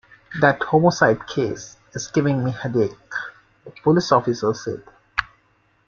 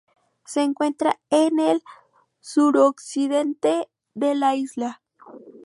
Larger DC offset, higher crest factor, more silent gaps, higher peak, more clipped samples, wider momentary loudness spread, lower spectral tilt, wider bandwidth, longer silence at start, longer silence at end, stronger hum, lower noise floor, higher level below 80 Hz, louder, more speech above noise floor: neither; about the same, 20 dB vs 18 dB; neither; first, 0 dBFS vs -6 dBFS; neither; first, 15 LU vs 10 LU; first, -6 dB/octave vs -4 dB/octave; second, 7.4 kHz vs 11.5 kHz; second, 0.3 s vs 0.5 s; first, 0.65 s vs 0.15 s; neither; first, -62 dBFS vs -45 dBFS; first, -54 dBFS vs -76 dBFS; about the same, -21 LUFS vs -22 LUFS; first, 42 dB vs 24 dB